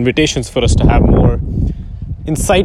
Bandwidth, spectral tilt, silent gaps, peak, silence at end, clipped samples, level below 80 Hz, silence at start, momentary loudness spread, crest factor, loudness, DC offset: 14 kHz; -5.5 dB/octave; none; 0 dBFS; 0 s; under 0.1%; -18 dBFS; 0 s; 14 LU; 12 dB; -13 LUFS; under 0.1%